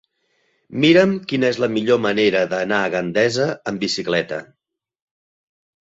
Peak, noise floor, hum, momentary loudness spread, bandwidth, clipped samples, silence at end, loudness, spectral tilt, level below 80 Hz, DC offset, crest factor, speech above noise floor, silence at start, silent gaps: -2 dBFS; -66 dBFS; none; 8 LU; 8 kHz; under 0.1%; 1.4 s; -18 LUFS; -5 dB/octave; -60 dBFS; under 0.1%; 18 dB; 48 dB; 0.7 s; none